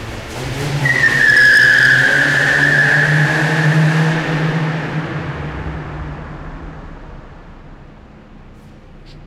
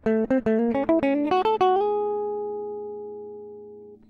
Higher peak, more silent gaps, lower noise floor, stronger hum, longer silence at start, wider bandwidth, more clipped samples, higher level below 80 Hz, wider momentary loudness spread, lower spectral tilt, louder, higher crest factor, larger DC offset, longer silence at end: first, -2 dBFS vs -10 dBFS; neither; second, -39 dBFS vs -44 dBFS; neither; about the same, 0 s vs 0.05 s; first, 15 kHz vs 6.8 kHz; neither; first, -36 dBFS vs -56 dBFS; about the same, 21 LU vs 19 LU; second, -5 dB/octave vs -7.5 dB/octave; first, -12 LUFS vs -24 LUFS; about the same, 12 dB vs 16 dB; neither; second, 0 s vs 0.15 s